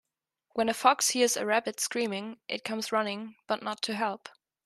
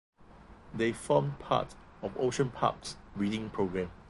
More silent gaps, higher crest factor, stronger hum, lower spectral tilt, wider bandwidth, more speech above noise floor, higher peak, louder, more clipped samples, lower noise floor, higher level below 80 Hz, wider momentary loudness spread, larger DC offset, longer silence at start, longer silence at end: neither; about the same, 22 dB vs 22 dB; neither; second, -2 dB/octave vs -6 dB/octave; first, 13.5 kHz vs 11.5 kHz; first, 48 dB vs 22 dB; first, -8 dBFS vs -12 dBFS; first, -29 LUFS vs -33 LUFS; neither; first, -78 dBFS vs -54 dBFS; second, -78 dBFS vs -56 dBFS; about the same, 12 LU vs 13 LU; neither; first, 0.55 s vs 0.2 s; first, 0.35 s vs 0 s